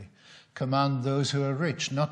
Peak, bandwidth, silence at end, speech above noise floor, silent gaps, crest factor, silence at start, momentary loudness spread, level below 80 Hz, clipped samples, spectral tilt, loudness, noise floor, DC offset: -12 dBFS; 9.6 kHz; 0 s; 28 dB; none; 16 dB; 0 s; 6 LU; -70 dBFS; under 0.1%; -5.5 dB/octave; -28 LUFS; -55 dBFS; under 0.1%